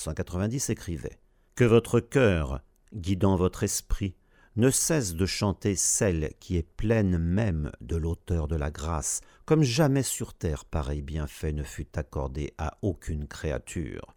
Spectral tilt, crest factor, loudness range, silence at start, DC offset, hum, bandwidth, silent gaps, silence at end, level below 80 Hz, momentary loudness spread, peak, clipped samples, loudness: -5 dB/octave; 20 dB; 6 LU; 0 s; under 0.1%; none; over 20 kHz; none; 0.1 s; -38 dBFS; 12 LU; -8 dBFS; under 0.1%; -28 LUFS